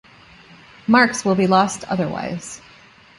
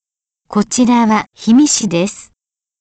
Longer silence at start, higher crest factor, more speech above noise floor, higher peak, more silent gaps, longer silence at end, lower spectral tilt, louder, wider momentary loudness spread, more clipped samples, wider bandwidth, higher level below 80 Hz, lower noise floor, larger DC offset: first, 0.9 s vs 0.5 s; first, 20 dB vs 12 dB; second, 30 dB vs 61 dB; about the same, -2 dBFS vs -4 dBFS; neither; about the same, 0.6 s vs 0.6 s; about the same, -5 dB/octave vs -4 dB/octave; second, -18 LUFS vs -13 LUFS; first, 16 LU vs 9 LU; neither; first, 11.5 kHz vs 9.2 kHz; about the same, -56 dBFS vs -52 dBFS; second, -48 dBFS vs -73 dBFS; neither